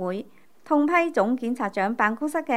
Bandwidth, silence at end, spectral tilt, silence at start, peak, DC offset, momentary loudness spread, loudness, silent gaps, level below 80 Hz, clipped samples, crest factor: 13.5 kHz; 0 s; -6 dB/octave; 0 s; -6 dBFS; 0.3%; 7 LU; -24 LUFS; none; -76 dBFS; under 0.1%; 18 dB